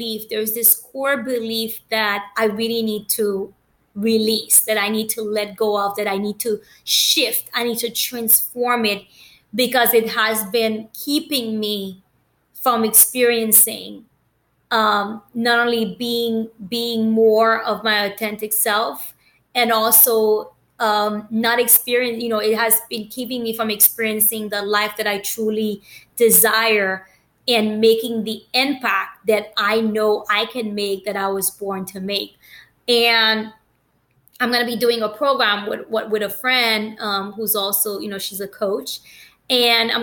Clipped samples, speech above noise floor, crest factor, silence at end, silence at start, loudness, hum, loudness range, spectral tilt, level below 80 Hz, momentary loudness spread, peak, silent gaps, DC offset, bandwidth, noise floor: under 0.1%; 45 dB; 18 dB; 0 s; 0 s; -18 LUFS; none; 4 LU; -1.5 dB/octave; -66 dBFS; 12 LU; -2 dBFS; none; under 0.1%; 17.5 kHz; -64 dBFS